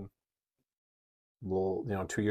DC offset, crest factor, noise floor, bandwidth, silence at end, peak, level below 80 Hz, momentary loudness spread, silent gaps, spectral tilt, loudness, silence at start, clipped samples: under 0.1%; 18 dB; -89 dBFS; 14.5 kHz; 0 s; -18 dBFS; -64 dBFS; 14 LU; 0.78-1.35 s; -6.5 dB/octave; -34 LUFS; 0 s; under 0.1%